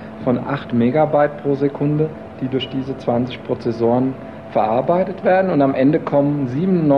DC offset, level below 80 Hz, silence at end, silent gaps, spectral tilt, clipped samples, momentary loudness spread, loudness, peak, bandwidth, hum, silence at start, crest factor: 0.3%; -52 dBFS; 0 s; none; -9.5 dB/octave; under 0.1%; 8 LU; -18 LUFS; -4 dBFS; 6.2 kHz; none; 0 s; 14 dB